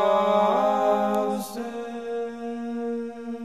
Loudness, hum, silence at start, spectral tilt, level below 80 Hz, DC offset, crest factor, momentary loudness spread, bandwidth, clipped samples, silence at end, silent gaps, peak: -25 LUFS; none; 0 s; -5.5 dB/octave; -68 dBFS; 0.2%; 16 dB; 12 LU; 14 kHz; under 0.1%; 0 s; none; -8 dBFS